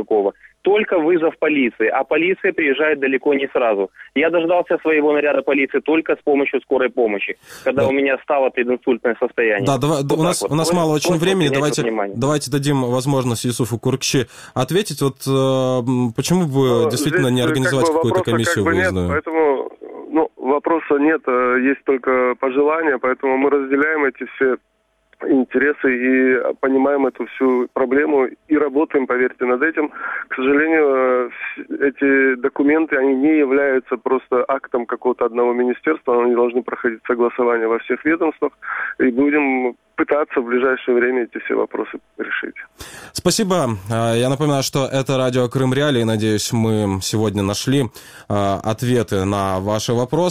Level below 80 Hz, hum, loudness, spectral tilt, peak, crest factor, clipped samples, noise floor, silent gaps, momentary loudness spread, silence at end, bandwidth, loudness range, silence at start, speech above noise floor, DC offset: -52 dBFS; none; -18 LUFS; -5.5 dB/octave; -4 dBFS; 14 dB; under 0.1%; -56 dBFS; none; 6 LU; 0 s; 16 kHz; 2 LU; 0 s; 39 dB; under 0.1%